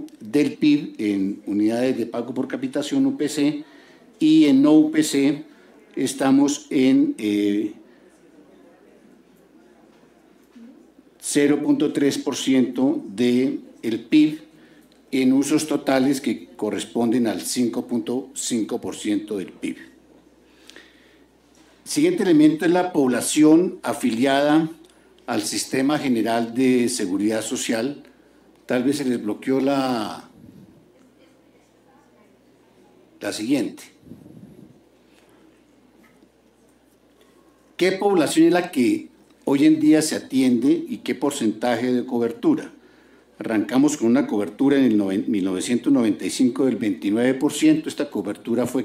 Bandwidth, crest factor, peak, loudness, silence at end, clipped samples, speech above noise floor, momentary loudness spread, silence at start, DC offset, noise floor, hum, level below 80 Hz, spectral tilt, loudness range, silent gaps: 15.5 kHz; 16 dB; -4 dBFS; -21 LUFS; 0 s; under 0.1%; 37 dB; 11 LU; 0 s; under 0.1%; -57 dBFS; none; -68 dBFS; -4.5 dB/octave; 12 LU; none